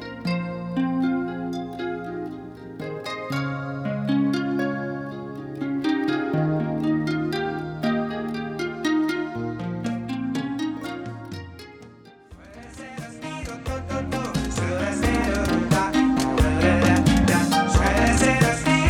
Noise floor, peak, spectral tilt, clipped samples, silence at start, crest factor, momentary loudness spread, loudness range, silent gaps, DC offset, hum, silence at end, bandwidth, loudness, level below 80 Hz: -47 dBFS; -4 dBFS; -5.5 dB/octave; under 0.1%; 0 s; 20 dB; 16 LU; 12 LU; none; under 0.1%; none; 0 s; 18 kHz; -24 LUFS; -36 dBFS